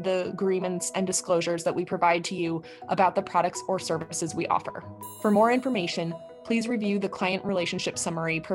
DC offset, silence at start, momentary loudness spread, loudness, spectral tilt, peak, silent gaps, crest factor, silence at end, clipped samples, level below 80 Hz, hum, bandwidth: under 0.1%; 0 s; 8 LU; -27 LUFS; -4.5 dB/octave; -8 dBFS; none; 18 dB; 0 s; under 0.1%; -66 dBFS; none; 16 kHz